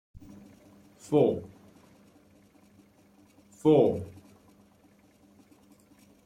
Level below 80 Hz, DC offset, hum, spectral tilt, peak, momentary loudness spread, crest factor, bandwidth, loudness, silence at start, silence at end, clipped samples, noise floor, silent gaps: -66 dBFS; under 0.1%; none; -8 dB/octave; -10 dBFS; 29 LU; 22 dB; 13 kHz; -26 LUFS; 0.15 s; 2.15 s; under 0.1%; -61 dBFS; none